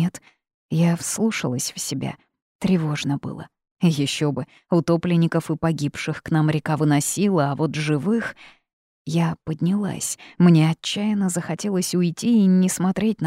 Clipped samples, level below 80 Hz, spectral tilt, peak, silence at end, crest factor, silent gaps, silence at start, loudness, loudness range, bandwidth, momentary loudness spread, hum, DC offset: under 0.1%; -58 dBFS; -5.5 dB/octave; -4 dBFS; 0 s; 18 dB; 0.54-0.69 s, 2.42-2.59 s, 3.71-3.76 s, 8.73-9.05 s; 0 s; -22 LUFS; 4 LU; 15.5 kHz; 10 LU; none; under 0.1%